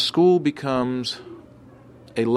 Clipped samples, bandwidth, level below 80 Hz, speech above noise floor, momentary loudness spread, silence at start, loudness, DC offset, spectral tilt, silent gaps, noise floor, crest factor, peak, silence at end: under 0.1%; 12 kHz; -60 dBFS; 26 dB; 16 LU; 0 s; -22 LUFS; under 0.1%; -6 dB/octave; none; -47 dBFS; 16 dB; -6 dBFS; 0 s